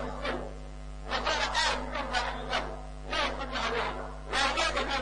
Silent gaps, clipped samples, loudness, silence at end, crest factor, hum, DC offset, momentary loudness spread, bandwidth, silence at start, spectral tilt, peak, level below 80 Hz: none; under 0.1%; -31 LUFS; 0 s; 20 dB; none; under 0.1%; 14 LU; 10 kHz; 0 s; -2.5 dB/octave; -12 dBFS; -42 dBFS